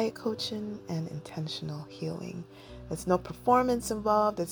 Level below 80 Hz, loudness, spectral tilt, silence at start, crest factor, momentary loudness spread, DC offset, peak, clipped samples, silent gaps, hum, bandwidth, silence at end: -56 dBFS; -31 LUFS; -5.5 dB/octave; 0 s; 20 dB; 14 LU; under 0.1%; -10 dBFS; under 0.1%; none; none; over 20 kHz; 0 s